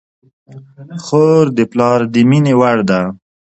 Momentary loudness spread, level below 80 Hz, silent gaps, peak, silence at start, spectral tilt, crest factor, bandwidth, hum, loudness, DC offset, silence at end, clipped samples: 10 LU; -54 dBFS; none; 0 dBFS; 0.5 s; -7.5 dB/octave; 14 dB; 8.4 kHz; none; -12 LUFS; under 0.1%; 0.45 s; under 0.1%